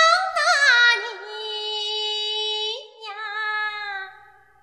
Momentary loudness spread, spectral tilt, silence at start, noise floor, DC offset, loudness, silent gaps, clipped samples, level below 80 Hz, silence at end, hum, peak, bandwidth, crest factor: 17 LU; 3 dB/octave; 0 s; -51 dBFS; under 0.1%; -20 LUFS; none; under 0.1%; -76 dBFS; 0.45 s; none; -4 dBFS; 14.5 kHz; 18 dB